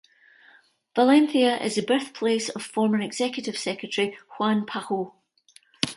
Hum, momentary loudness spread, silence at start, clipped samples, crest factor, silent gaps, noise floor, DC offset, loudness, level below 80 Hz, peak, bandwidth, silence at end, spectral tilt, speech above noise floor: none; 11 LU; 0.95 s; under 0.1%; 24 dB; none; -58 dBFS; under 0.1%; -24 LUFS; -72 dBFS; 0 dBFS; 11.5 kHz; 0 s; -4 dB/octave; 34 dB